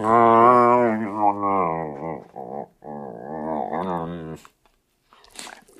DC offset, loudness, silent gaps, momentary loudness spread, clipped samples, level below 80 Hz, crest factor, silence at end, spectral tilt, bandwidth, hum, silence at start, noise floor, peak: under 0.1%; -20 LUFS; none; 23 LU; under 0.1%; -60 dBFS; 20 dB; 0.3 s; -7 dB/octave; 12.5 kHz; none; 0 s; -64 dBFS; -2 dBFS